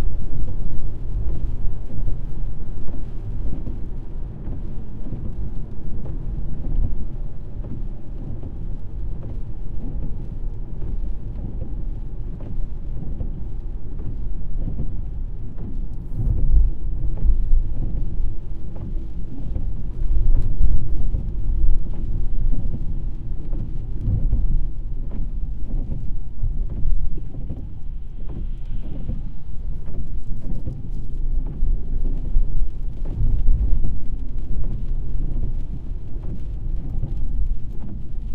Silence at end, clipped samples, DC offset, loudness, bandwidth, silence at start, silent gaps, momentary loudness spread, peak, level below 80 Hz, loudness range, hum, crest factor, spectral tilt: 0 s; under 0.1%; under 0.1%; -30 LUFS; 1.3 kHz; 0 s; none; 10 LU; -2 dBFS; -22 dBFS; 7 LU; none; 14 dB; -10.5 dB/octave